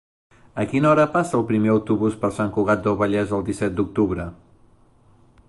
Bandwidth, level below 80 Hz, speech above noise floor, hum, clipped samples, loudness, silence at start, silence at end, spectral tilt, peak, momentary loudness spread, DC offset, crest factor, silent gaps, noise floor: 11.5 kHz; -46 dBFS; 34 dB; none; under 0.1%; -21 LUFS; 0.55 s; 1.15 s; -7.5 dB/octave; -6 dBFS; 7 LU; under 0.1%; 16 dB; none; -54 dBFS